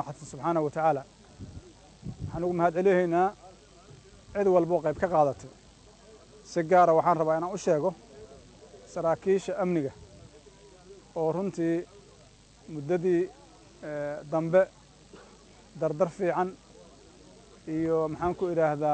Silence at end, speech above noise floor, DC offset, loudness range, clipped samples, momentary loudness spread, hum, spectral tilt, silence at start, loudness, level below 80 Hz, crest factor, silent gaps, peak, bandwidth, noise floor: 0 s; 29 dB; under 0.1%; 6 LU; under 0.1%; 20 LU; none; -7 dB/octave; 0 s; -28 LUFS; -58 dBFS; 18 dB; none; -10 dBFS; 9 kHz; -56 dBFS